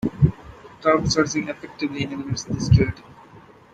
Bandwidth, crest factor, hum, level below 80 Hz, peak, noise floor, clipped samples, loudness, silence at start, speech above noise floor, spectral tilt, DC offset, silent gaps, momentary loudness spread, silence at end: 9 kHz; 20 dB; none; -38 dBFS; -2 dBFS; -47 dBFS; under 0.1%; -22 LUFS; 0.05 s; 26 dB; -6 dB/octave; under 0.1%; none; 11 LU; 0.35 s